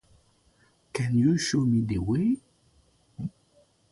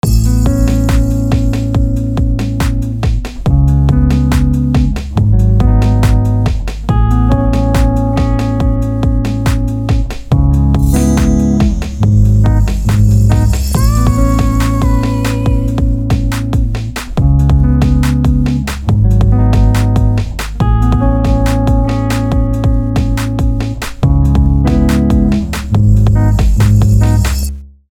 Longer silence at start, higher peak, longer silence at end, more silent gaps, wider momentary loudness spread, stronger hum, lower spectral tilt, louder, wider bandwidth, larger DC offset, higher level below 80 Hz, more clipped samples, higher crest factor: first, 0.95 s vs 0.05 s; second, -12 dBFS vs 0 dBFS; first, 0.6 s vs 0.2 s; neither; first, 15 LU vs 6 LU; neither; second, -6 dB/octave vs -7.5 dB/octave; second, -27 LUFS vs -12 LUFS; second, 11.5 kHz vs 15.5 kHz; neither; second, -52 dBFS vs -14 dBFS; neither; first, 16 dB vs 10 dB